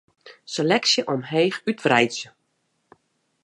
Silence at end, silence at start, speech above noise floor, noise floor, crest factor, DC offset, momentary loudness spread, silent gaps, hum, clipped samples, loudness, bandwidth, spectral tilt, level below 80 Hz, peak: 1.15 s; 0.25 s; 50 dB; -72 dBFS; 20 dB; under 0.1%; 13 LU; none; none; under 0.1%; -21 LUFS; 11.5 kHz; -3.5 dB/octave; -70 dBFS; -4 dBFS